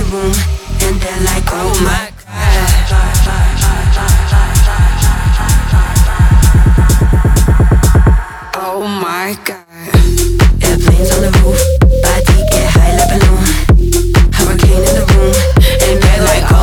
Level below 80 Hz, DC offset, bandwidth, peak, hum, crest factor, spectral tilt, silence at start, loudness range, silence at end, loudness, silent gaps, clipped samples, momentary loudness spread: -10 dBFS; under 0.1%; 18 kHz; 0 dBFS; none; 8 dB; -5 dB/octave; 0 s; 3 LU; 0 s; -11 LUFS; none; under 0.1%; 7 LU